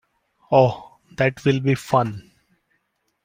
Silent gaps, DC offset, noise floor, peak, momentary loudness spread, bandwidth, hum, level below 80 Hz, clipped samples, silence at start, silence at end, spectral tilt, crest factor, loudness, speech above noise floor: none; under 0.1%; -71 dBFS; -2 dBFS; 20 LU; 16 kHz; none; -58 dBFS; under 0.1%; 0.5 s; 1.05 s; -7 dB/octave; 20 dB; -20 LUFS; 52 dB